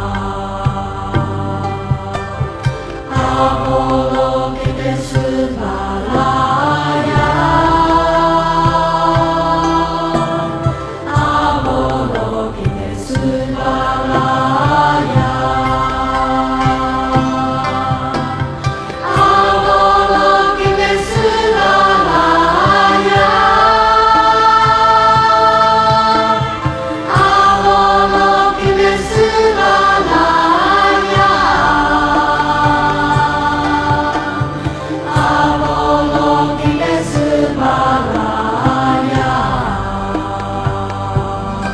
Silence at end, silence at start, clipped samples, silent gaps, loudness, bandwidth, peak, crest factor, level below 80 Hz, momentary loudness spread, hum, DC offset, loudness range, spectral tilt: 0 s; 0 s; under 0.1%; none; -13 LUFS; 11 kHz; 0 dBFS; 12 dB; -30 dBFS; 10 LU; none; under 0.1%; 7 LU; -5.5 dB/octave